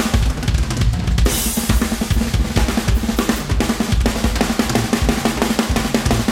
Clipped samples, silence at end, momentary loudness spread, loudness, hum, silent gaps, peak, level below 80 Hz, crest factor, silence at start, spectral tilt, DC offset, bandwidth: under 0.1%; 0 s; 2 LU; -18 LUFS; none; none; 0 dBFS; -22 dBFS; 16 dB; 0 s; -5 dB/octave; under 0.1%; 16.5 kHz